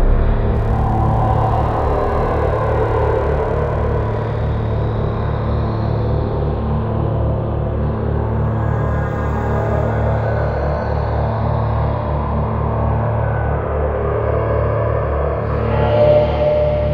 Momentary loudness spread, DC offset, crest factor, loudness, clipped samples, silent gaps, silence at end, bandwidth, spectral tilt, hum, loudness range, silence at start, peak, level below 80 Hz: 4 LU; under 0.1%; 14 dB; -18 LUFS; under 0.1%; none; 0 s; 5.2 kHz; -10 dB/octave; none; 2 LU; 0 s; -2 dBFS; -22 dBFS